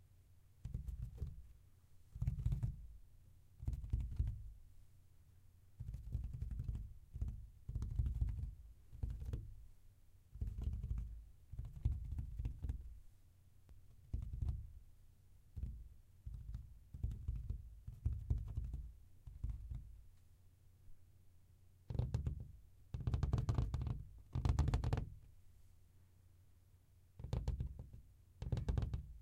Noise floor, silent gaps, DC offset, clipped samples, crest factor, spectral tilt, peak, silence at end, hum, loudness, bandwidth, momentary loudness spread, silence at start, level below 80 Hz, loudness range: -67 dBFS; none; under 0.1%; under 0.1%; 22 dB; -8 dB/octave; -24 dBFS; 0 s; none; -46 LUFS; 10.5 kHz; 20 LU; 0 s; -48 dBFS; 9 LU